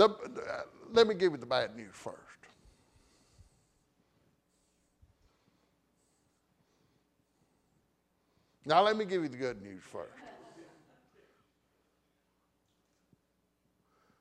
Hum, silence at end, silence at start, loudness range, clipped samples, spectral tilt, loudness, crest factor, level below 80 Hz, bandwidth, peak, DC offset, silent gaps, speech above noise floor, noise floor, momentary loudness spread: none; 3.6 s; 0 s; 20 LU; under 0.1%; -5 dB/octave; -31 LUFS; 26 dB; -74 dBFS; 10 kHz; -10 dBFS; under 0.1%; none; 46 dB; -77 dBFS; 22 LU